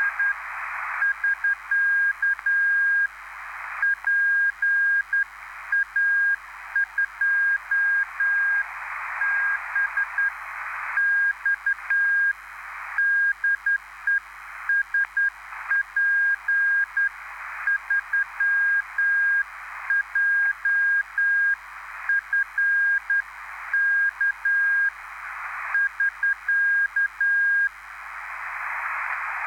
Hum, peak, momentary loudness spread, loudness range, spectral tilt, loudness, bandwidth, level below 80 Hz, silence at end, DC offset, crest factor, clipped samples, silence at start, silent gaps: none; -14 dBFS; 12 LU; 2 LU; 0 dB/octave; -22 LUFS; 17 kHz; -62 dBFS; 0 s; under 0.1%; 10 dB; under 0.1%; 0 s; none